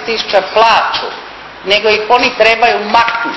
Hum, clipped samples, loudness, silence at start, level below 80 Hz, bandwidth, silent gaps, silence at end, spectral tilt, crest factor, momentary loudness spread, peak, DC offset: none; 0.4%; -10 LUFS; 0 s; -46 dBFS; 8 kHz; none; 0 s; -2.5 dB/octave; 12 dB; 15 LU; 0 dBFS; under 0.1%